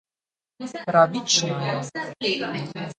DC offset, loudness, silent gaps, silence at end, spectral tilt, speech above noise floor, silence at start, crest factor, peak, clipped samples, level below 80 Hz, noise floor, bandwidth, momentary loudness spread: under 0.1%; -23 LUFS; none; 0.05 s; -3.5 dB/octave; over 66 dB; 0.6 s; 22 dB; -4 dBFS; under 0.1%; -68 dBFS; under -90 dBFS; 9.4 kHz; 13 LU